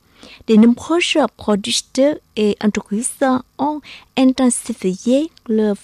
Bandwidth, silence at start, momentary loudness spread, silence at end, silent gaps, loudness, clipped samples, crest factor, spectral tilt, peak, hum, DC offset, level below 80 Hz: 13.5 kHz; 0.25 s; 9 LU; 0.05 s; none; -17 LUFS; under 0.1%; 14 dB; -4.5 dB/octave; -4 dBFS; none; under 0.1%; -54 dBFS